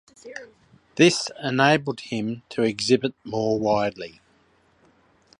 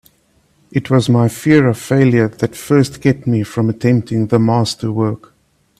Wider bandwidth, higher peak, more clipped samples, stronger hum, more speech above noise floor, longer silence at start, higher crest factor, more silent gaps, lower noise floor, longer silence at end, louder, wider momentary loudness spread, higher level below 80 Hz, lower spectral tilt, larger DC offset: second, 11.5 kHz vs 14.5 kHz; about the same, -2 dBFS vs 0 dBFS; neither; neither; second, 38 dB vs 43 dB; second, 0.25 s vs 0.75 s; first, 22 dB vs 14 dB; neither; first, -61 dBFS vs -57 dBFS; first, 1.3 s vs 0.65 s; second, -23 LUFS vs -15 LUFS; first, 21 LU vs 7 LU; second, -60 dBFS vs -50 dBFS; second, -4.5 dB/octave vs -7 dB/octave; neither